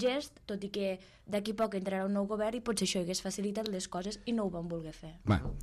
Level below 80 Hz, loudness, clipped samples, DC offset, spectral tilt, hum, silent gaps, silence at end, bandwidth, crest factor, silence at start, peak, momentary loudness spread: -52 dBFS; -35 LUFS; under 0.1%; under 0.1%; -5 dB/octave; none; none; 0 s; 13.5 kHz; 20 dB; 0 s; -14 dBFS; 8 LU